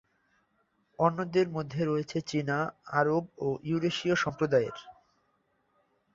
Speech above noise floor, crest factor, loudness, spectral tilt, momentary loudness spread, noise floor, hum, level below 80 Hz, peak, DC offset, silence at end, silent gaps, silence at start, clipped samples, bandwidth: 44 dB; 22 dB; -30 LUFS; -6 dB/octave; 5 LU; -73 dBFS; none; -68 dBFS; -10 dBFS; under 0.1%; 1.25 s; none; 1 s; under 0.1%; 7.8 kHz